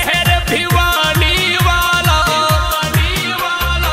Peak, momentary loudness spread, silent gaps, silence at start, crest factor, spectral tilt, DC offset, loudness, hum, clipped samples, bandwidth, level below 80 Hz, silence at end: 0 dBFS; 4 LU; none; 0 s; 14 dB; -3.5 dB/octave; under 0.1%; -13 LUFS; none; under 0.1%; 16.5 kHz; -22 dBFS; 0 s